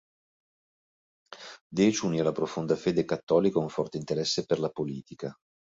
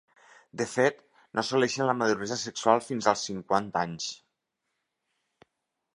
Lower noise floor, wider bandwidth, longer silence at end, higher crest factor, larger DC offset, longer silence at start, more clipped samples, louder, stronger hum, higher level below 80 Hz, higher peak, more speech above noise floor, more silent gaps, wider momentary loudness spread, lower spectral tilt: first, under -90 dBFS vs -82 dBFS; second, 8 kHz vs 11.5 kHz; second, 0.4 s vs 1.8 s; about the same, 20 dB vs 24 dB; neither; first, 1.3 s vs 0.55 s; neither; about the same, -28 LUFS vs -28 LUFS; neither; first, -64 dBFS vs -70 dBFS; second, -10 dBFS vs -6 dBFS; first, over 62 dB vs 55 dB; first, 1.61-1.70 s, 3.23-3.27 s vs none; first, 15 LU vs 10 LU; first, -5.5 dB/octave vs -4 dB/octave